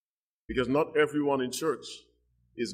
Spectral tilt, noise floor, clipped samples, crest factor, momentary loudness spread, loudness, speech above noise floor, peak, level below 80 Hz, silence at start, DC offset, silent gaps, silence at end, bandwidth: -4.5 dB/octave; -61 dBFS; under 0.1%; 18 dB; 18 LU; -29 LUFS; 33 dB; -14 dBFS; -56 dBFS; 0.5 s; under 0.1%; none; 0 s; 15.5 kHz